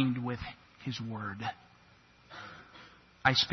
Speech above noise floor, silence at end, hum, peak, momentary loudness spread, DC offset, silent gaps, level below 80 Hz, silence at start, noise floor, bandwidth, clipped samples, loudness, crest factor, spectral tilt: 29 dB; 0 s; none; -10 dBFS; 24 LU; under 0.1%; none; -62 dBFS; 0 s; -61 dBFS; 6.4 kHz; under 0.1%; -34 LUFS; 26 dB; -4.5 dB/octave